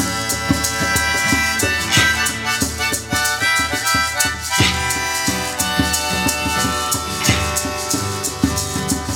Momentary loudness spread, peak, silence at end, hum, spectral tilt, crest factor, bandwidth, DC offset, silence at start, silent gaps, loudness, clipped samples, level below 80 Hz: 4 LU; 0 dBFS; 0 s; none; -2.5 dB/octave; 18 dB; 19.5 kHz; under 0.1%; 0 s; none; -17 LUFS; under 0.1%; -34 dBFS